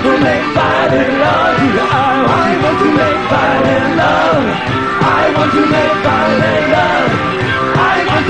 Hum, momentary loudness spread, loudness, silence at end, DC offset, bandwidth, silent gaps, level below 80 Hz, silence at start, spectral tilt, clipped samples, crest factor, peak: none; 2 LU; -11 LUFS; 0 s; 0.7%; 10 kHz; none; -38 dBFS; 0 s; -6 dB/octave; under 0.1%; 12 dB; 0 dBFS